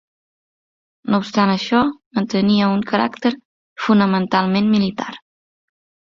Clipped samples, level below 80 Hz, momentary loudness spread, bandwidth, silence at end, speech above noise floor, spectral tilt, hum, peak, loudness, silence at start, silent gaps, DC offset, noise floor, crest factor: under 0.1%; -56 dBFS; 10 LU; 7.2 kHz; 0.95 s; over 73 dB; -6.5 dB/octave; none; -2 dBFS; -18 LUFS; 1.05 s; 2.06-2.11 s, 3.45-3.76 s; under 0.1%; under -90 dBFS; 18 dB